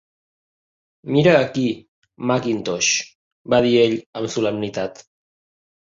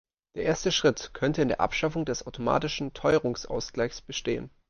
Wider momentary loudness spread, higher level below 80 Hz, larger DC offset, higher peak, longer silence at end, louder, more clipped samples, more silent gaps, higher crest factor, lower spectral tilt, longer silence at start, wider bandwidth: first, 13 LU vs 8 LU; second, -58 dBFS vs -50 dBFS; neither; first, -2 dBFS vs -8 dBFS; first, 0.85 s vs 0.2 s; first, -19 LUFS vs -28 LUFS; neither; first, 1.88-2.02 s, 3.15-3.45 s, 4.06-4.13 s vs none; about the same, 20 dB vs 20 dB; about the same, -4.5 dB/octave vs -4.5 dB/octave; first, 1.05 s vs 0.35 s; about the same, 7.8 kHz vs 7.2 kHz